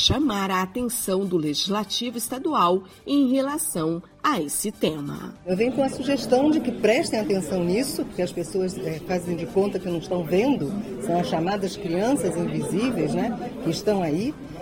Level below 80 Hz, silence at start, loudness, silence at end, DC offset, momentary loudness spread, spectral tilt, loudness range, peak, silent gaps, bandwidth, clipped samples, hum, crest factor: -50 dBFS; 0 s; -24 LUFS; 0 s; under 0.1%; 7 LU; -4.5 dB/octave; 2 LU; -6 dBFS; none; 16.5 kHz; under 0.1%; none; 18 dB